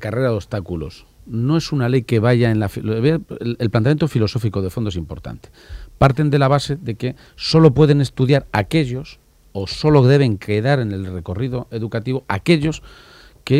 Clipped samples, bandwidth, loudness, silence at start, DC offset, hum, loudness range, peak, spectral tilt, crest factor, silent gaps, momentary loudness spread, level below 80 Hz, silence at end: under 0.1%; 13.5 kHz; -18 LUFS; 0 s; under 0.1%; none; 4 LU; 0 dBFS; -7.5 dB/octave; 18 dB; none; 15 LU; -40 dBFS; 0 s